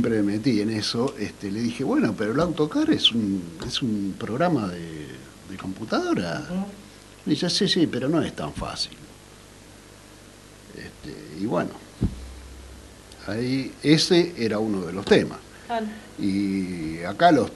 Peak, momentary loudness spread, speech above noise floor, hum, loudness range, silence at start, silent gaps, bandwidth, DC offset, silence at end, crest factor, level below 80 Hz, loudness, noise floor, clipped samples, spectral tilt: -2 dBFS; 20 LU; 23 dB; 50 Hz at -55 dBFS; 10 LU; 0 s; none; 12 kHz; under 0.1%; 0 s; 22 dB; -48 dBFS; -24 LUFS; -47 dBFS; under 0.1%; -5 dB/octave